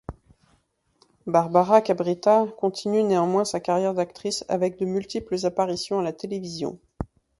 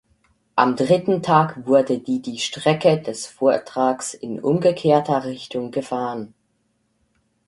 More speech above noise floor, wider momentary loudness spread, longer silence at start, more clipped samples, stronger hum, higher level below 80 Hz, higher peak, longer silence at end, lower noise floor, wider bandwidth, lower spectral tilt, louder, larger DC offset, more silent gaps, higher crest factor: second, 44 dB vs 48 dB; about the same, 13 LU vs 11 LU; second, 0.1 s vs 0.55 s; neither; neither; first, -52 dBFS vs -62 dBFS; about the same, -2 dBFS vs -2 dBFS; second, 0.35 s vs 1.2 s; about the same, -67 dBFS vs -68 dBFS; about the same, 11.5 kHz vs 11.5 kHz; about the same, -5.5 dB/octave vs -5.5 dB/octave; second, -24 LUFS vs -20 LUFS; neither; neither; about the same, 22 dB vs 20 dB